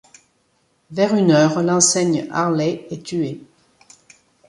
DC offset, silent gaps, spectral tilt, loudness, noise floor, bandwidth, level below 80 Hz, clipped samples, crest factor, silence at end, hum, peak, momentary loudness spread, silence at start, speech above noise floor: under 0.1%; none; -4.5 dB/octave; -18 LUFS; -64 dBFS; 11.5 kHz; -62 dBFS; under 0.1%; 18 dB; 1.1 s; none; -2 dBFS; 14 LU; 0.9 s; 46 dB